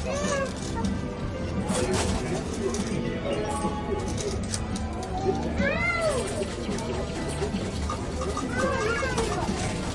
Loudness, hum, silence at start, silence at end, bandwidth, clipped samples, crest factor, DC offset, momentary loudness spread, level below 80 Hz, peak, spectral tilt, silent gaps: -28 LUFS; none; 0 s; 0 s; 11.5 kHz; under 0.1%; 18 dB; under 0.1%; 5 LU; -38 dBFS; -10 dBFS; -5 dB/octave; none